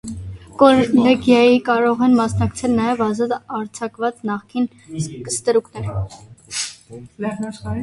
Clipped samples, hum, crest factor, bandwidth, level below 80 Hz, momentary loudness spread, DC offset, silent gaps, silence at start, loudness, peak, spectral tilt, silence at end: under 0.1%; none; 18 dB; 11.5 kHz; -44 dBFS; 15 LU; under 0.1%; none; 0.05 s; -18 LUFS; 0 dBFS; -5.5 dB/octave; 0 s